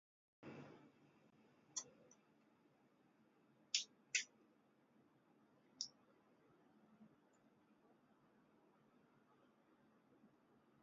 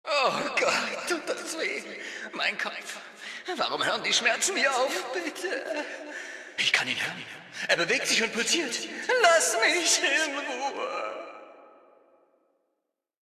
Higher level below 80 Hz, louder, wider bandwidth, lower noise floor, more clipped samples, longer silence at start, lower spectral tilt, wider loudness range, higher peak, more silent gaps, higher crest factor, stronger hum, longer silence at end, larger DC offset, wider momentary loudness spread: second, under -90 dBFS vs -82 dBFS; second, -46 LUFS vs -26 LUFS; second, 7.2 kHz vs 14.5 kHz; second, -76 dBFS vs -82 dBFS; neither; first, 0.4 s vs 0.05 s; about the same, 0.5 dB/octave vs -0.5 dB/octave; first, 11 LU vs 6 LU; second, -24 dBFS vs -6 dBFS; neither; first, 34 dB vs 22 dB; neither; second, 0.55 s vs 1.7 s; neither; first, 20 LU vs 15 LU